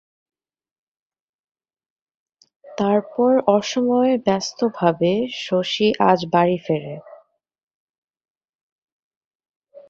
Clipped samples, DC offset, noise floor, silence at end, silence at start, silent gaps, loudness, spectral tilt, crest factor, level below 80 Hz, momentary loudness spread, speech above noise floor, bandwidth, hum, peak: under 0.1%; under 0.1%; -53 dBFS; 0.1 s; 2.65 s; 7.63-7.68 s, 7.74-8.08 s, 8.30-8.41 s, 8.49-9.40 s, 9.49-9.62 s; -19 LUFS; -5.5 dB/octave; 20 dB; -64 dBFS; 8 LU; 34 dB; 7.6 kHz; none; -2 dBFS